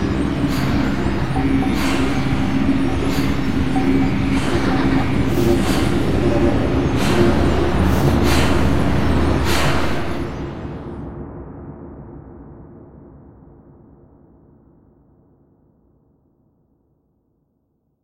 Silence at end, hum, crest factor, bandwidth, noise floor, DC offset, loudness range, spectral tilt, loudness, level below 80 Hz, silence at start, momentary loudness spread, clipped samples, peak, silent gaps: 0 s; none; 18 dB; 16 kHz; -67 dBFS; under 0.1%; 17 LU; -6.5 dB/octave; -18 LUFS; -28 dBFS; 0 s; 17 LU; under 0.1%; 0 dBFS; none